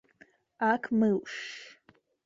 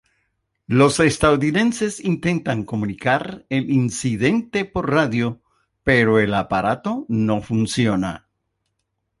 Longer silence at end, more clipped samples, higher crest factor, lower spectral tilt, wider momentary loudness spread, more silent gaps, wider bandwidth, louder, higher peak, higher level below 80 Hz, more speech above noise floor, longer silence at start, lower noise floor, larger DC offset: second, 0.55 s vs 1 s; neither; about the same, 20 dB vs 18 dB; about the same, -6 dB/octave vs -5.5 dB/octave; first, 18 LU vs 9 LU; neither; second, 7.6 kHz vs 11.5 kHz; second, -29 LUFS vs -20 LUFS; second, -12 dBFS vs -2 dBFS; second, -74 dBFS vs -46 dBFS; second, 36 dB vs 55 dB; about the same, 0.6 s vs 0.7 s; second, -65 dBFS vs -75 dBFS; neither